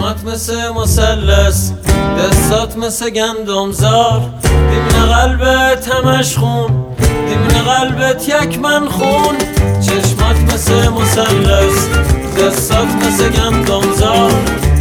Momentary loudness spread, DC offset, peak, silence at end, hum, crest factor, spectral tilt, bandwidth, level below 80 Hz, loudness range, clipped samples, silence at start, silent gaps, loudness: 5 LU; under 0.1%; 0 dBFS; 0 s; none; 12 dB; -4.5 dB/octave; 18 kHz; -18 dBFS; 1 LU; under 0.1%; 0 s; none; -12 LUFS